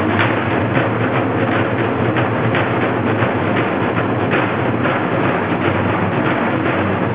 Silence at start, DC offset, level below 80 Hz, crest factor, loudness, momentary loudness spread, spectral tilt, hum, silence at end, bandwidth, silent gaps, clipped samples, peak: 0 s; 0.4%; -42 dBFS; 14 dB; -17 LUFS; 1 LU; -10.5 dB/octave; none; 0 s; 4 kHz; none; under 0.1%; -2 dBFS